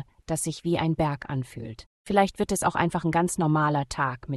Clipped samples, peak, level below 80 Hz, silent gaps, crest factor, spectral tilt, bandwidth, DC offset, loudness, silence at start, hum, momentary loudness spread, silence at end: under 0.1%; -6 dBFS; -50 dBFS; 1.86-2.05 s; 20 dB; -5.5 dB/octave; 12.5 kHz; under 0.1%; -26 LUFS; 0 s; none; 10 LU; 0 s